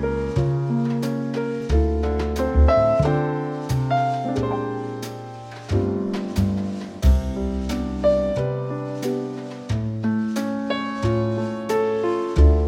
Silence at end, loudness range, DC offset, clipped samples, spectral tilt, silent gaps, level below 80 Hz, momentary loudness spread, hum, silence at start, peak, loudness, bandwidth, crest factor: 0 s; 4 LU; under 0.1%; under 0.1%; -7.5 dB/octave; none; -26 dBFS; 9 LU; none; 0 s; -4 dBFS; -23 LUFS; 13.5 kHz; 18 dB